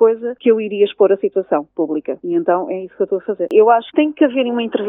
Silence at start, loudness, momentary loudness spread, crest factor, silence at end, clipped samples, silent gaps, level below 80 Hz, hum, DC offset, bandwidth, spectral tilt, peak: 0 s; -16 LUFS; 8 LU; 16 dB; 0 s; under 0.1%; none; -70 dBFS; none; under 0.1%; 3.9 kHz; -8.5 dB/octave; 0 dBFS